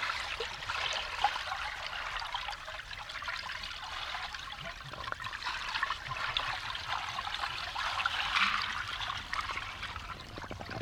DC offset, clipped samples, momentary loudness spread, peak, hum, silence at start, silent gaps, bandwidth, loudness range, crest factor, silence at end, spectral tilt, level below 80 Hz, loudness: under 0.1%; under 0.1%; 10 LU; -12 dBFS; none; 0 s; none; 17 kHz; 6 LU; 24 dB; 0 s; -1.5 dB/octave; -54 dBFS; -35 LUFS